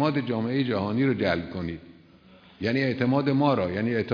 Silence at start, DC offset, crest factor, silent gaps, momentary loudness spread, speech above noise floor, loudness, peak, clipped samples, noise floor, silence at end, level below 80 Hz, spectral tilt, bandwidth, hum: 0 s; under 0.1%; 18 dB; none; 10 LU; 28 dB; -26 LUFS; -8 dBFS; under 0.1%; -53 dBFS; 0 s; -58 dBFS; -8.5 dB/octave; 5.2 kHz; none